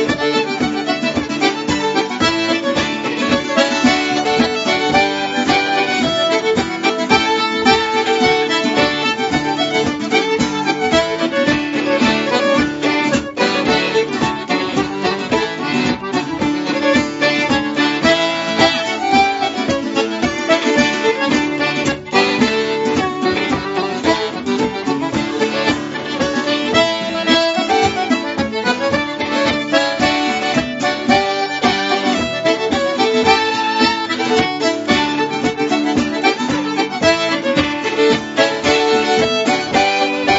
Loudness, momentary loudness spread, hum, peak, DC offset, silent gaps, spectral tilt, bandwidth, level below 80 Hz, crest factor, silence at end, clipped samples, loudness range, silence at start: -16 LUFS; 5 LU; none; 0 dBFS; under 0.1%; none; -4 dB/octave; 8 kHz; -46 dBFS; 16 dB; 0 s; under 0.1%; 2 LU; 0 s